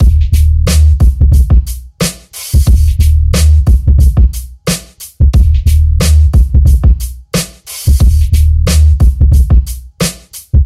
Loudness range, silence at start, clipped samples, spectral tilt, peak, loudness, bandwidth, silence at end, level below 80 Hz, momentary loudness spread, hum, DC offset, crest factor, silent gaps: 1 LU; 0 s; under 0.1%; -5.5 dB/octave; 0 dBFS; -10 LUFS; 14.5 kHz; 0 s; -8 dBFS; 8 LU; none; 0.4%; 8 dB; none